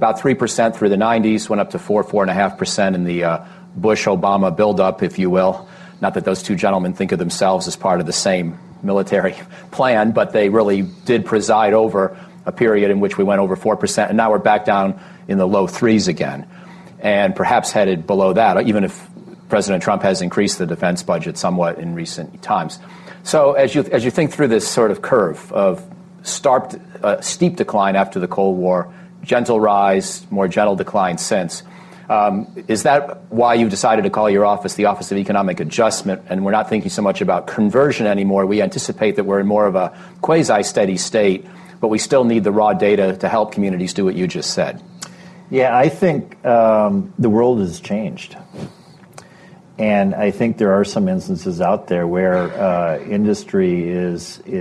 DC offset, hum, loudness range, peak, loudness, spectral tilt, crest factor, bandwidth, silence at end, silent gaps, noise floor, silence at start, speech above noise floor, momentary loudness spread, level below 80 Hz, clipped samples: under 0.1%; none; 3 LU; -4 dBFS; -17 LUFS; -5.5 dB/octave; 14 dB; 12.5 kHz; 0 s; none; -43 dBFS; 0 s; 27 dB; 9 LU; -52 dBFS; under 0.1%